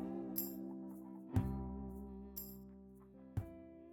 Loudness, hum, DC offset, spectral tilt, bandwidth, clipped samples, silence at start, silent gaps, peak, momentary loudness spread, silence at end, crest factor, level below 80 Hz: -45 LUFS; none; under 0.1%; -7 dB/octave; 19 kHz; under 0.1%; 0 s; none; -22 dBFS; 17 LU; 0 s; 24 dB; -56 dBFS